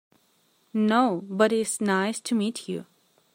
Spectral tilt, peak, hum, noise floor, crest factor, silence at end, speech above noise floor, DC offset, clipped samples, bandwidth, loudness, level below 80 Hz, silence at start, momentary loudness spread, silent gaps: -4.5 dB/octave; -6 dBFS; none; -66 dBFS; 20 dB; 0.55 s; 41 dB; under 0.1%; under 0.1%; 16 kHz; -25 LUFS; -74 dBFS; 0.75 s; 12 LU; none